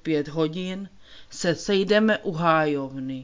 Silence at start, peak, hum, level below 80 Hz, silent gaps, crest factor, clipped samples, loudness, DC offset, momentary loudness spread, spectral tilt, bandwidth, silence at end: 0.05 s; -6 dBFS; none; -58 dBFS; none; 18 dB; under 0.1%; -24 LUFS; under 0.1%; 14 LU; -5.5 dB/octave; 7.6 kHz; 0 s